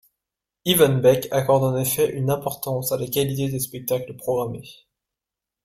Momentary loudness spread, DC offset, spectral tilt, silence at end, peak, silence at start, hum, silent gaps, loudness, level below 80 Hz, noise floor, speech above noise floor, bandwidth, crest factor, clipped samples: 9 LU; under 0.1%; -5 dB/octave; 0.95 s; -4 dBFS; 0.65 s; none; none; -22 LUFS; -56 dBFS; -87 dBFS; 66 dB; 16 kHz; 20 dB; under 0.1%